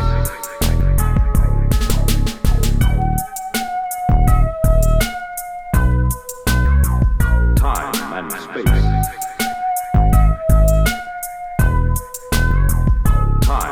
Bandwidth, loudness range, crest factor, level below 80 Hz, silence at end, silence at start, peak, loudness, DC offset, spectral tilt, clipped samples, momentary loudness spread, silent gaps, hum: 17.5 kHz; 1 LU; 14 dB; -16 dBFS; 0 s; 0 s; 0 dBFS; -18 LUFS; 1%; -5.5 dB/octave; under 0.1%; 7 LU; none; none